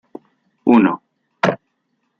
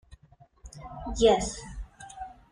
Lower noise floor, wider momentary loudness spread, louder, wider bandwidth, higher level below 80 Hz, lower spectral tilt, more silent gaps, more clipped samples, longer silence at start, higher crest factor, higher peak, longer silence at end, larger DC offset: first, -70 dBFS vs -58 dBFS; second, 16 LU vs 23 LU; first, -17 LUFS vs -25 LUFS; second, 7 kHz vs 10.5 kHz; second, -62 dBFS vs -44 dBFS; first, -7 dB/octave vs -4 dB/octave; neither; neither; first, 0.65 s vs 0.1 s; about the same, 18 dB vs 22 dB; first, -2 dBFS vs -8 dBFS; first, 0.65 s vs 0.2 s; neither